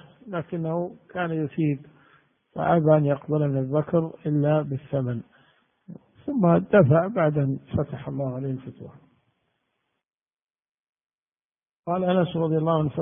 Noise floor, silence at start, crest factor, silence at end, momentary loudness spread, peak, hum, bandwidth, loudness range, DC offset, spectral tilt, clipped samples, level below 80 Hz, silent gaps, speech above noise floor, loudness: -77 dBFS; 0.25 s; 20 dB; 0 s; 15 LU; -6 dBFS; none; 3.7 kHz; 11 LU; under 0.1%; -12.5 dB/octave; under 0.1%; -58 dBFS; 10.42-10.46 s, 10.69-10.93 s, 11.15-11.26 s, 11.45-11.50 s, 11.79-11.83 s; 54 dB; -24 LUFS